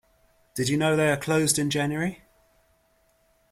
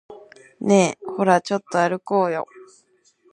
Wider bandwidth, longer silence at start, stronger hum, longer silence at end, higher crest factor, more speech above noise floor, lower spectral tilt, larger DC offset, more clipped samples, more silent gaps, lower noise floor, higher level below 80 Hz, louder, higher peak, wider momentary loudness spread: first, 16 kHz vs 11 kHz; first, 0.55 s vs 0.1 s; neither; first, 1.35 s vs 0.7 s; about the same, 18 dB vs 20 dB; about the same, 42 dB vs 41 dB; about the same, -4.5 dB/octave vs -5.5 dB/octave; neither; neither; neither; first, -66 dBFS vs -60 dBFS; first, -60 dBFS vs -70 dBFS; second, -24 LUFS vs -21 LUFS; second, -8 dBFS vs -2 dBFS; second, 8 LU vs 11 LU